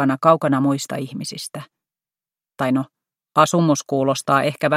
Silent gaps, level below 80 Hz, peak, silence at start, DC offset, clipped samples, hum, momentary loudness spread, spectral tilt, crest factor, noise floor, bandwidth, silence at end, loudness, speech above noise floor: none; -66 dBFS; 0 dBFS; 0 s; under 0.1%; under 0.1%; none; 14 LU; -5.5 dB/octave; 20 dB; under -90 dBFS; 15.5 kHz; 0 s; -19 LUFS; over 71 dB